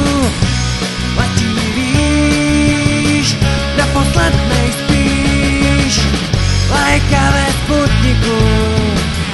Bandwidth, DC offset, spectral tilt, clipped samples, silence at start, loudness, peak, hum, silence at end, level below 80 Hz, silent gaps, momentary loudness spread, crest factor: 12 kHz; under 0.1%; -5 dB/octave; under 0.1%; 0 s; -13 LUFS; 0 dBFS; none; 0 s; -20 dBFS; none; 3 LU; 12 dB